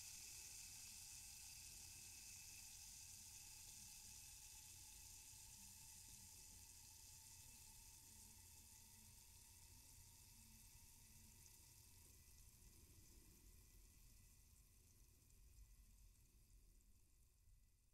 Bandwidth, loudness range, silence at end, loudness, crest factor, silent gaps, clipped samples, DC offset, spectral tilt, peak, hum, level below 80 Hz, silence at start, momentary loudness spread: 16 kHz; 11 LU; 0 s; -60 LUFS; 20 dB; none; under 0.1%; under 0.1%; -1 dB/octave; -44 dBFS; none; -74 dBFS; 0 s; 11 LU